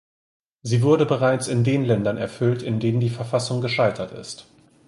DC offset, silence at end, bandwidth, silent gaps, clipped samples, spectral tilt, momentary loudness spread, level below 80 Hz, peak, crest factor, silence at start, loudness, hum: under 0.1%; 0.45 s; 11.5 kHz; none; under 0.1%; -6.5 dB/octave; 14 LU; -56 dBFS; -6 dBFS; 16 dB; 0.65 s; -22 LUFS; none